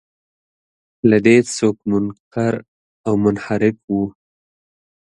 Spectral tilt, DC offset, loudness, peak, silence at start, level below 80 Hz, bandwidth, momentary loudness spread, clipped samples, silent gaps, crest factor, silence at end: -6 dB/octave; under 0.1%; -18 LUFS; 0 dBFS; 1.05 s; -54 dBFS; 11 kHz; 11 LU; under 0.1%; 2.20-2.31 s, 2.68-3.04 s, 3.84-3.88 s; 18 dB; 0.95 s